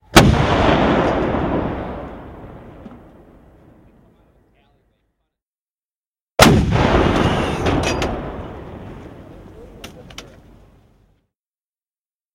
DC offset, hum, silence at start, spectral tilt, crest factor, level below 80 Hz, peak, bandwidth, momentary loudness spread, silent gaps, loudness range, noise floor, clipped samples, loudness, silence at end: under 0.1%; none; 0.15 s; -5 dB/octave; 20 dB; -32 dBFS; 0 dBFS; 16.5 kHz; 26 LU; 5.55-5.76 s, 5.85-5.89 s, 5.98-6.13 s, 6.21-6.27 s; 21 LU; under -90 dBFS; under 0.1%; -16 LUFS; 2.1 s